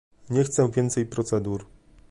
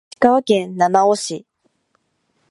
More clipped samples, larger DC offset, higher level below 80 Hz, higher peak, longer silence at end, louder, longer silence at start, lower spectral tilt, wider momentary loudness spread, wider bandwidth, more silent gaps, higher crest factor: neither; neither; first, -52 dBFS vs -66 dBFS; second, -10 dBFS vs 0 dBFS; second, 0.45 s vs 1.15 s; second, -25 LUFS vs -16 LUFS; about the same, 0.25 s vs 0.2 s; first, -6.5 dB/octave vs -4.5 dB/octave; second, 8 LU vs 11 LU; about the same, 11.5 kHz vs 11.5 kHz; neither; about the same, 16 dB vs 18 dB